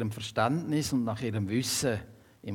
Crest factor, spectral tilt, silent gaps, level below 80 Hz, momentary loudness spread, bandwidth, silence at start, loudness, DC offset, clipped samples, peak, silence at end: 18 dB; -4.5 dB/octave; none; -62 dBFS; 5 LU; 18 kHz; 0 s; -30 LUFS; under 0.1%; under 0.1%; -12 dBFS; 0 s